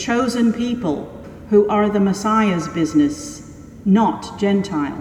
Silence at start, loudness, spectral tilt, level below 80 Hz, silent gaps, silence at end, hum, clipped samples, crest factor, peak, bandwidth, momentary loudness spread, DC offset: 0 s; -18 LUFS; -6 dB/octave; -46 dBFS; none; 0 s; none; under 0.1%; 16 dB; -4 dBFS; 12.5 kHz; 15 LU; under 0.1%